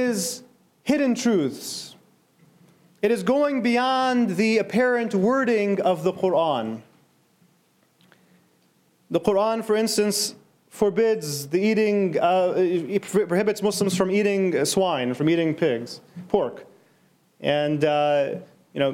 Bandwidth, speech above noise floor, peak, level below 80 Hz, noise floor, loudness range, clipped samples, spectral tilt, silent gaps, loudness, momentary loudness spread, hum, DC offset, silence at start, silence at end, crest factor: 16.5 kHz; 41 dB; -4 dBFS; -66 dBFS; -63 dBFS; 5 LU; under 0.1%; -4.5 dB/octave; none; -23 LUFS; 9 LU; none; under 0.1%; 0 s; 0 s; 18 dB